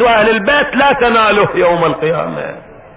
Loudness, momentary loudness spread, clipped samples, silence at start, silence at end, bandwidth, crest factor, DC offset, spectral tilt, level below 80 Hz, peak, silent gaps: -11 LUFS; 10 LU; under 0.1%; 0 s; 0.1 s; 4 kHz; 12 dB; under 0.1%; -8.5 dB/octave; -40 dBFS; 0 dBFS; none